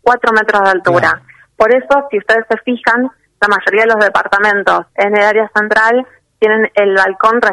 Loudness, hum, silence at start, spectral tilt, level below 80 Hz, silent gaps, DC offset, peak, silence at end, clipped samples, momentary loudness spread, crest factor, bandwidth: -11 LUFS; none; 0.05 s; -5 dB/octave; -50 dBFS; none; under 0.1%; 0 dBFS; 0 s; under 0.1%; 5 LU; 12 dB; 12 kHz